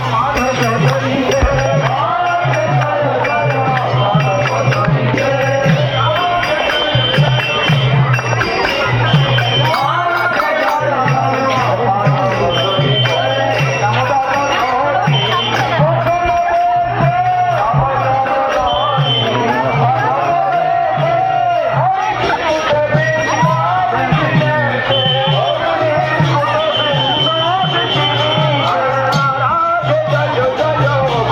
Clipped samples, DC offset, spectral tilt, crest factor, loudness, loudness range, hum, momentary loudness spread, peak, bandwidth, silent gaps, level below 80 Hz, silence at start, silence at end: under 0.1%; under 0.1%; -5.5 dB/octave; 12 dB; -13 LUFS; 1 LU; none; 2 LU; 0 dBFS; 13.5 kHz; none; -36 dBFS; 0 s; 0 s